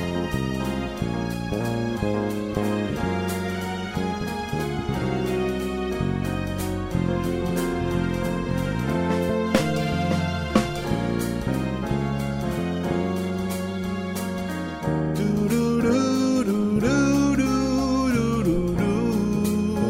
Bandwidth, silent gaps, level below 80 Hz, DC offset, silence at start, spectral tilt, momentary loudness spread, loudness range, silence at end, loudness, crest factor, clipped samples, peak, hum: 16 kHz; none; -40 dBFS; under 0.1%; 0 s; -6.5 dB/octave; 7 LU; 5 LU; 0 s; -25 LUFS; 20 dB; under 0.1%; -4 dBFS; none